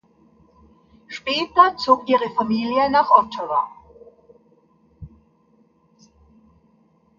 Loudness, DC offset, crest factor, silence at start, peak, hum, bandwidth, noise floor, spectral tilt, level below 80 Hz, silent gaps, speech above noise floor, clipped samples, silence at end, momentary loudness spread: -19 LUFS; under 0.1%; 22 dB; 1.1 s; 0 dBFS; none; 7.4 kHz; -59 dBFS; -5 dB/octave; -56 dBFS; none; 41 dB; under 0.1%; 2.1 s; 10 LU